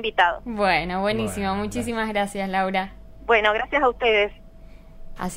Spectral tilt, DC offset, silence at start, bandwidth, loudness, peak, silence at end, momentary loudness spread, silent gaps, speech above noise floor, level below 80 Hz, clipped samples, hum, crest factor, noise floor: -4.5 dB/octave; under 0.1%; 0 s; 16 kHz; -22 LUFS; -6 dBFS; 0 s; 8 LU; none; 21 dB; -42 dBFS; under 0.1%; none; 18 dB; -43 dBFS